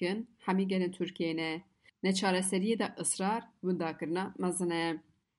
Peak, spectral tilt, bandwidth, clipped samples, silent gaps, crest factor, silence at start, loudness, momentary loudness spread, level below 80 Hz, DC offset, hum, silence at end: -18 dBFS; -4.5 dB/octave; 11.5 kHz; under 0.1%; none; 16 dB; 0 s; -33 LUFS; 6 LU; -76 dBFS; under 0.1%; none; 0.35 s